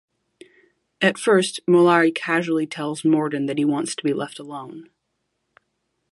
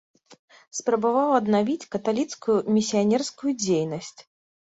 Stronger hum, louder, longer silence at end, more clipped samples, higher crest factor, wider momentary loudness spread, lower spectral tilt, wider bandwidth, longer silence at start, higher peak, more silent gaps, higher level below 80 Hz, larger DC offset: neither; first, -20 LUFS vs -24 LUFS; first, 1.3 s vs 0.55 s; neither; about the same, 20 dB vs 18 dB; first, 16 LU vs 9 LU; about the same, -5 dB/octave vs -5 dB/octave; first, 11.5 kHz vs 8 kHz; first, 1 s vs 0.3 s; first, -2 dBFS vs -6 dBFS; second, none vs 0.39-0.48 s; second, -74 dBFS vs -68 dBFS; neither